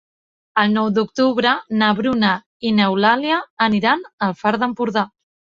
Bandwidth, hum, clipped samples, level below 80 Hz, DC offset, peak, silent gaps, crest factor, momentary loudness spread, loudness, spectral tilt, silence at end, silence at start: 7.2 kHz; none; under 0.1%; -58 dBFS; under 0.1%; -2 dBFS; 2.46-2.60 s, 3.50-3.57 s, 4.13-4.18 s; 18 dB; 6 LU; -18 LUFS; -6 dB/octave; 0.5 s; 0.55 s